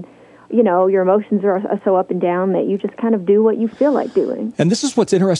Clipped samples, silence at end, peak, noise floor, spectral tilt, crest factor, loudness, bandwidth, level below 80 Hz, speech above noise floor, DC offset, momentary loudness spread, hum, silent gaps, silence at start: under 0.1%; 0 s; -2 dBFS; -41 dBFS; -6 dB/octave; 14 dB; -17 LUFS; 11 kHz; -66 dBFS; 25 dB; under 0.1%; 5 LU; none; none; 0 s